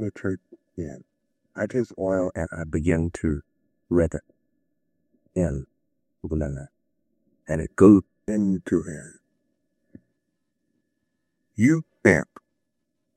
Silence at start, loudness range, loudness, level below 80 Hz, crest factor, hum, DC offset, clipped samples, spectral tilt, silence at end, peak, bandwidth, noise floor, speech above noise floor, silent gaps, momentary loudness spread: 0 s; 9 LU; -23 LUFS; -48 dBFS; 24 dB; none; under 0.1%; under 0.1%; -8 dB/octave; 0.95 s; -2 dBFS; 9.8 kHz; -79 dBFS; 56 dB; none; 18 LU